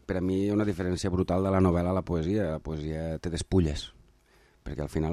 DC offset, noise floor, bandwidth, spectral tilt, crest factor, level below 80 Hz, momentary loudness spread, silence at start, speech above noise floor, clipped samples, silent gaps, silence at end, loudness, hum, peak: under 0.1%; -62 dBFS; 12.5 kHz; -7 dB/octave; 18 dB; -44 dBFS; 12 LU; 0.1 s; 34 dB; under 0.1%; none; 0 s; -29 LUFS; none; -12 dBFS